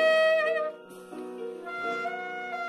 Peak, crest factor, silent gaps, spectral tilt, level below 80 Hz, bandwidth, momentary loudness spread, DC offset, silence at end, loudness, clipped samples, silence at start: -14 dBFS; 16 dB; none; -3 dB/octave; -84 dBFS; 12 kHz; 18 LU; under 0.1%; 0 s; -29 LUFS; under 0.1%; 0 s